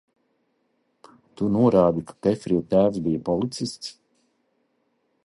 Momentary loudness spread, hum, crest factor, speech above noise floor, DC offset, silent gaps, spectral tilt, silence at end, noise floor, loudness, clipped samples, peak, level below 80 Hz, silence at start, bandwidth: 12 LU; none; 20 dB; 49 dB; under 0.1%; none; -7.5 dB/octave; 1.35 s; -70 dBFS; -23 LUFS; under 0.1%; -6 dBFS; -54 dBFS; 1.4 s; 11.5 kHz